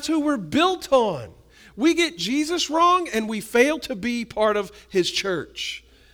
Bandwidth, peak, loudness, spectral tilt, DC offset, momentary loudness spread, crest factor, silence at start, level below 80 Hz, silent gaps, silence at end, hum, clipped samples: over 20 kHz; -4 dBFS; -22 LUFS; -3.5 dB/octave; under 0.1%; 10 LU; 18 dB; 0 s; -54 dBFS; none; 0.35 s; none; under 0.1%